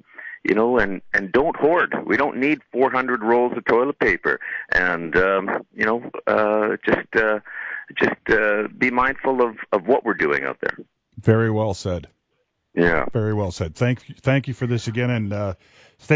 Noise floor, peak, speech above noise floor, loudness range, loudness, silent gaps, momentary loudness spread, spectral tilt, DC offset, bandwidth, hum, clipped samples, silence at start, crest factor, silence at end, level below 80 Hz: -72 dBFS; -2 dBFS; 51 dB; 3 LU; -21 LUFS; none; 8 LU; -7 dB/octave; under 0.1%; 8 kHz; none; under 0.1%; 0.2 s; 18 dB; 0 s; -46 dBFS